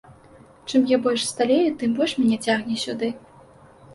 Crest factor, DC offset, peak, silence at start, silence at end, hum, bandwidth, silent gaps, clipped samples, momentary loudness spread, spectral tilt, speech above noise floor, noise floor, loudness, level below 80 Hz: 16 dB; under 0.1%; -8 dBFS; 0.1 s; 0 s; none; 11.5 kHz; none; under 0.1%; 9 LU; -4 dB/octave; 28 dB; -49 dBFS; -22 LUFS; -62 dBFS